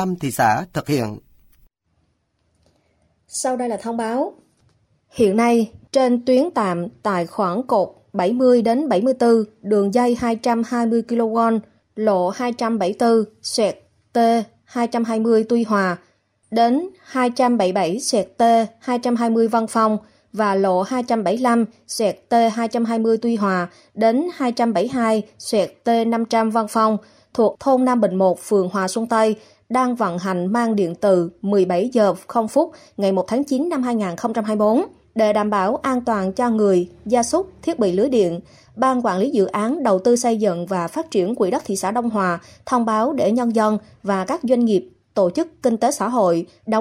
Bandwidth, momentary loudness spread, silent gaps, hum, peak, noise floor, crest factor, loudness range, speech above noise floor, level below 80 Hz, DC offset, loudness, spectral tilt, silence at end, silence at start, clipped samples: 15.5 kHz; 6 LU; none; none; -4 dBFS; -67 dBFS; 14 dB; 2 LU; 48 dB; -60 dBFS; under 0.1%; -19 LUFS; -5.5 dB/octave; 0 s; 0 s; under 0.1%